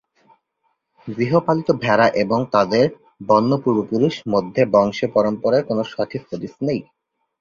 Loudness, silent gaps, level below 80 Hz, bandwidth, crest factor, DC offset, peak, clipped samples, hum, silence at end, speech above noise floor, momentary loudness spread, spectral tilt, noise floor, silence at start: -19 LUFS; none; -58 dBFS; 7.2 kHz; 18 dB; under 0.1%; -2 dBFS; under 0.1%; none; 0.6 s; 52 dB; 10 LU; -7 dB/octave; -70 dBFS; 1.05 s